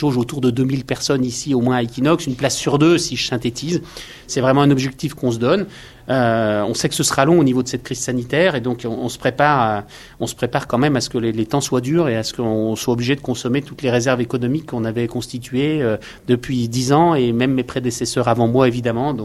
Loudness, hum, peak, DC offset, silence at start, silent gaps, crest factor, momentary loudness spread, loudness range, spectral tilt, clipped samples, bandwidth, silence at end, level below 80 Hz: -18 LUFS; none; 0 dBFS; under 0.1%; 0 s; none; 18 dB; 9 LU; 3 LU; -5 dB/octave; under 0.1%; 13.5 kHz; 0 s; -46 dBFS